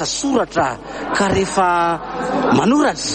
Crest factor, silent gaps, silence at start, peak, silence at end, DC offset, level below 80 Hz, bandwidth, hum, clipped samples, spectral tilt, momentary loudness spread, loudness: 14 dB; none; 0 s; -2 dBFS; 0 s; under 0.1%; -42 dBFS; 9.2 kHz; none; under 0.1%; -4 dB/octave; 7 LU; -17 LUFS